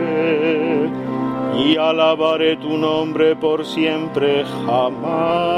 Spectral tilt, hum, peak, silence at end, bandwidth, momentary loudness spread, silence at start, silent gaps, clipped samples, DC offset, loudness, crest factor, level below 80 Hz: -6.5 dB/octave; none; -2 dBFS; 0 s; 11.5 kHz; 5 LU; 0 s; none; under 0.1%; under 0.1%; -18 LUFS; 16 dB; -56 dBFS